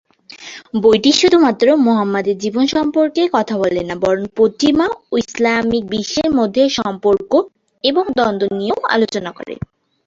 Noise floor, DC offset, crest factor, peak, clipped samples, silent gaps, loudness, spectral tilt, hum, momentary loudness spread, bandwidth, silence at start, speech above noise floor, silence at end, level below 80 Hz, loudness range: -37 dBFS; under 0.1%; 14 dB; -2 dBFS; under 0.1%; none; -15 LUFS; -4.5 dB/octave; none; 12 LU; 7.8 kHz; 0.3 s; 22 dB; 0.5 s; -50 dBFS; 3 LU